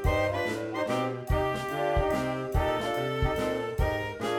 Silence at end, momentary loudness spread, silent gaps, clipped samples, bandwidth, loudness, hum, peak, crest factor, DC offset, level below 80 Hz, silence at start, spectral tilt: 0 s; 3 LU; none; under 0.1%; 18 kHz; -29 LUFS; none; -14 dBFS; 16 dB; under 0.1%; -36 dBFS; 0 s; -6 dB/octave